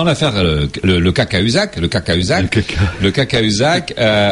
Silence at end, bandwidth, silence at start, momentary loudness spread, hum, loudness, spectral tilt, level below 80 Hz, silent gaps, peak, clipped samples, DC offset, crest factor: 0 s; 11.5 kHz; 0 s; 3 LU; none; -14 LUFS; -5 dB/octave; -30 dBFS; none; -2 dBFS; under 0.1%; under 0.1%; 12 dB